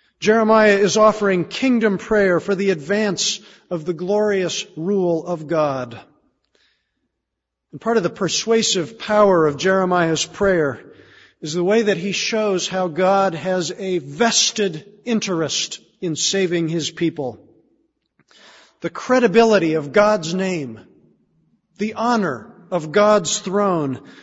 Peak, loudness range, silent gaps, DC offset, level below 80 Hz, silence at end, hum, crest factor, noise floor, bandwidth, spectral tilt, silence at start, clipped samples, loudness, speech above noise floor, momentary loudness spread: 0 dBFS; 5 LU; none; under 0.1%; -56 dBFS; 0.1 s; none; 18 dB; -80 dBFS; 8 kHz; -4 dB/octave; 0.2 s; under 0.1%; -18 LUFS; 61 dB; 12 LU